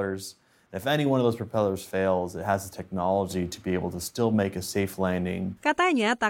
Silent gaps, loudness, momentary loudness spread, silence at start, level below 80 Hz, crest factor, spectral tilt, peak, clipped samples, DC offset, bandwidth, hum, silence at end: none; -27 LUFS; 9 LU; 0 s; -58 dBFS; 16 dB; -5.5 dB/octave; -10 dBFS; under 0.1%; under 0.1%; 17 kHz; none; 0 s